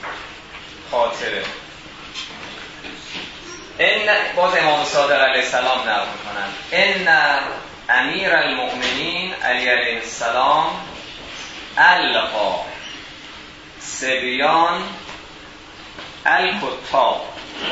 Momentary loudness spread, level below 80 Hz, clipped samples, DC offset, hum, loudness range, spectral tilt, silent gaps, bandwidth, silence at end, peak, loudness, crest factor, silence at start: 20 LU; -52 dBFS; under 0.1%; under 0.1%; none; 5 LU; -2 dB/octave; none; 8 kHz; 0 s; 0 dBFS; -17 LUFS; 20 dB; 0 s